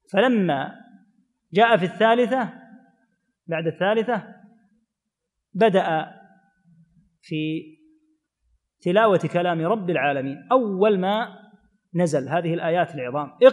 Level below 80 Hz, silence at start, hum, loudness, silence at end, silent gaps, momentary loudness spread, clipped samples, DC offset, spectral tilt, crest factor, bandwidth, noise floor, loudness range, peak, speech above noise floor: -76 dBFS; 0.15 s; none; -22 LUFS; 0 s; none; 12 LU; under 0.1%; under 0.1%; -6.5 dB/octave; 22 dB; 10.5 kHz; -82 dBFS; 5 LU; -2 dBFS; 61 dB